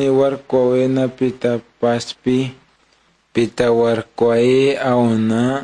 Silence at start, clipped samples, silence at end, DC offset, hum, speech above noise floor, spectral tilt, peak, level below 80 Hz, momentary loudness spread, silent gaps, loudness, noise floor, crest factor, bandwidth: 0 s; under 0.1%; 0 s; under 0.1%; none; 42 dB; -6.5 dB/octave; -2 dBFS; -52 dBFS; 6 LU; none; -17 LUFS; -58 dBFS; 14 dB; 10 kHz